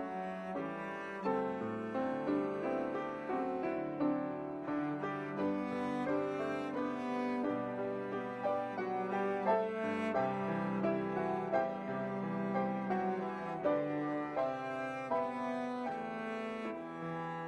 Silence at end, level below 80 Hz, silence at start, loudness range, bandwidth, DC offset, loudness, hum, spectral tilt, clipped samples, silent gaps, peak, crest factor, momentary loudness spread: 0 s; -74 dBFS; 0 s; 2 LU; 10 kHz; under 0.1%; -37 LUFS; none; -7.5 dB/octave; under 0.1%; none; -20 dBFS; 16 dB; 6 LU